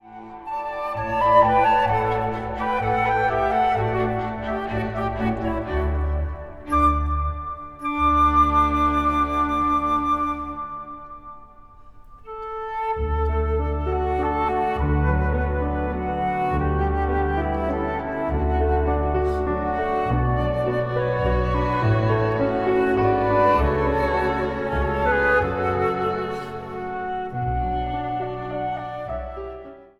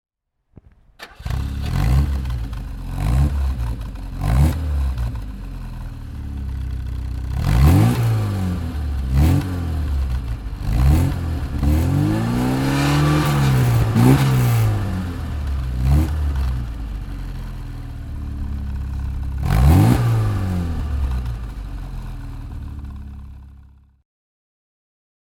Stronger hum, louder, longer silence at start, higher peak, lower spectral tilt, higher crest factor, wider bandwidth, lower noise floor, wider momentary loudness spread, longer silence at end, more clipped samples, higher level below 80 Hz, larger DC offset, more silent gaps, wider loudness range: neither; about the same, -22 LUFS vs -20 LUFS; second, 0.05 s vs 1 s; second, -4 dBFS vs 0 dBFS; about the same, -8 dB/octave vs -7 dB/octave; about the same, 18 dB vs 18 dB; second, 11.5 kHz vs 18.5 kHz; second, -45 dBFS vs -51 dBFS; second, 12 LU vs 17 LU; second, 0.15 s vs 1.7 s; neither; second, -30 dBFS vs -24 dBFS; neither; neither; second, 6 LU vs 10 LU